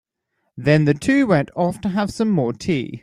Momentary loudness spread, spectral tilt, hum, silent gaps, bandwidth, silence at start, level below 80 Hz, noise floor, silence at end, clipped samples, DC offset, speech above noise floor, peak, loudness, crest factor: 7 LU; -7 dB/octave; none; none; 12 kHz; 0.55 s; -50 dBFS; -73 dBFS; 0.05 s; under 0.1%; under 0.1%; 54 dB; -2 dBFS; -19 LUFS; 16 dB